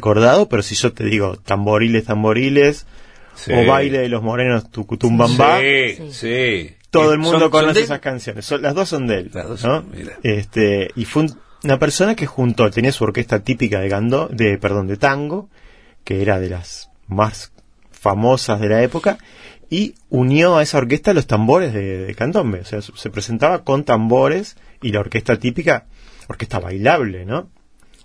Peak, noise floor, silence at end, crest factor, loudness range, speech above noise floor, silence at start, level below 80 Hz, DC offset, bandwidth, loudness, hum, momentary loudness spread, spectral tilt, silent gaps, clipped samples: 0 dBFS; -46 dBFS; 0.6 s; 16 dB; 5 LU; 30 dB; 0 s; -44 dBFS; 0.2%; 11 kHz; -17 LUFS; none; 13 LU; -5.5 dB/octave; none; under 0.1%